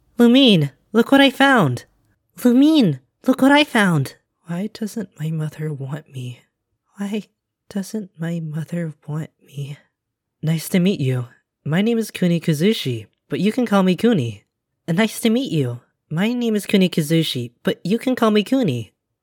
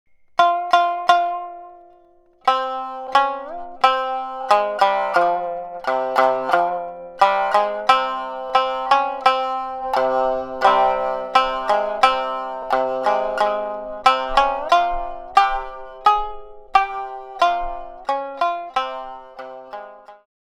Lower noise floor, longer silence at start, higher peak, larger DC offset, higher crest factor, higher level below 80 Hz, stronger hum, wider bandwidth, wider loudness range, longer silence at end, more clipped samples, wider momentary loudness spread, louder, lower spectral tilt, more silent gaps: first, -78 dBFS vs -53 dBFS; second, 0.2 s vs 0.4 s; about the same, -2 dBFS vs 0 dBFS; neither; about the same, 18 dB vs 20 dB; second, -66 dBFS vs -44 dBFS; neither; first, 18.5 kHz vs 13.5 kHz; first, 13 LU vs 3 LU; about the same, 0.35 s vs 0.3 s; neither; first, 17 LU vs 13 LU; about the same, -19 LUFS vs -20 LUFS; first, -6 dB/octave vs -2.5 dB/octave; neither